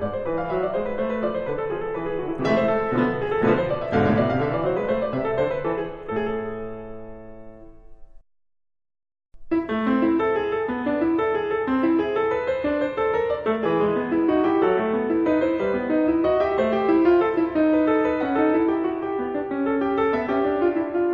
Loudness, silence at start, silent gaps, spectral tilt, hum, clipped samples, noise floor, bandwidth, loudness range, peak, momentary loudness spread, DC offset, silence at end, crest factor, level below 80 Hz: -23 LUFS; 0 s; none; -8.5 dB/octave; none; under 0.1%; -42 dBFS; 6.6 kHz; 9 LU; -6 dBFS; 7 LU; under 0.1%; 0 s; 16 dB; -48 dBFS